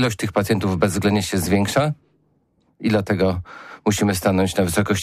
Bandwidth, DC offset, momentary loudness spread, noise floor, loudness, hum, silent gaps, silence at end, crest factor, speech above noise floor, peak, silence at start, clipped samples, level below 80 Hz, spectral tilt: 15.5 kHz; under 0.1%; 7 LU; -63 dBFS; -20 LUFS; none; none; 0 s; 14 dB; 44 dB; -6 dBFS; 0 s; under 0.1%; -46 dBFS; -5.5 dB/octave